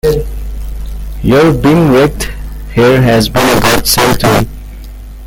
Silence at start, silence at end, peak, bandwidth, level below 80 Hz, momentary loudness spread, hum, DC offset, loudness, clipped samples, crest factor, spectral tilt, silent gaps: 0.05 s; 0 s; 0 dBFS; 17.5 kHz; -22 dBFS; 17 LU; none; under 0.1%; -9 LUFS; under 0.1%; 10 dB; -5 dB/octave; none